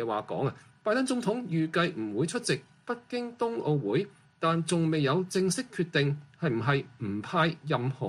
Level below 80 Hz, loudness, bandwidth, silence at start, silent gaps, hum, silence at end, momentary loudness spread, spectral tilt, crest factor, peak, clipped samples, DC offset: -68 dBFS; -30 LUFS; 14 kHz; 0 s; none; none; 0 s; 7 LU; -5.5 dB/octave; 16 dB; -12 dBFS; under 0.1%; under 0.1%